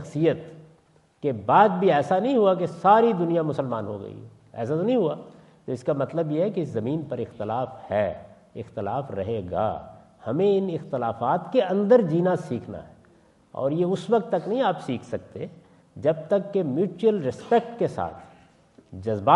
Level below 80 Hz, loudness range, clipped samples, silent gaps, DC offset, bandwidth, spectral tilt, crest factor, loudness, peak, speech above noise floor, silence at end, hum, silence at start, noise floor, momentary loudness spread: -66 dBFS; 7 LU; under 0.1%; none; under 0.1%; 11 kHz; -8 dB/octave; 20 dB; -24 LUFS; -4 dBFS; 35 dB; 0 s; none; 0 s; -59 dBFS; 18 LU